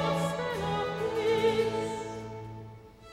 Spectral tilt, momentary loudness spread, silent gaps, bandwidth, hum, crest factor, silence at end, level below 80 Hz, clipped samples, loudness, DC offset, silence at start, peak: -5.5 dB/octave; 18 LU; none; 15.5 kHz; none; 16 dB; 0 s; -56 dBFS; under 0.1%; -30 LUFS; under 0.1%; 0 s; -16 dBFS